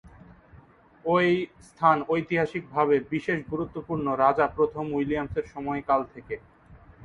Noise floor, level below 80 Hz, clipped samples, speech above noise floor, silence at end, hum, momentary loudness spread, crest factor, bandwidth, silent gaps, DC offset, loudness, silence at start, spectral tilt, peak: -54 dBFS; -54 dBFS; under 0.1%; 28 dB; 0 s; none; 11 LU; 20 dB; 11 kHz; none; under 0.1%; -26 LUFS; 0.05 s; -7.5 dB/octave; -6 dBFS